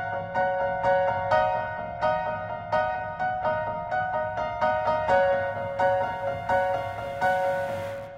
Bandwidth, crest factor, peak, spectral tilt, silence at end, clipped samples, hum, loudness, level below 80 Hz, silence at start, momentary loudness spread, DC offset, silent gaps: 12 kHz; 16 dB; -10 dBFS; -6 dB/octave; 0 s; under 0.1%; none; -26 LUFS; -52 dBFS; 0 s; 6 LU; under 0.1%; none